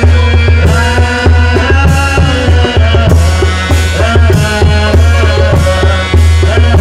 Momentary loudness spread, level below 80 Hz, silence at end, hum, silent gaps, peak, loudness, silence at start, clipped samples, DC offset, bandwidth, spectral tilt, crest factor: 2 LU; -12 dBFS; 0 s; none; none; 0 dBFS; -8 LUFS; 0 s; 0.4%; under 0.1%; 12 kHz; -6 dB/octave; 6 dB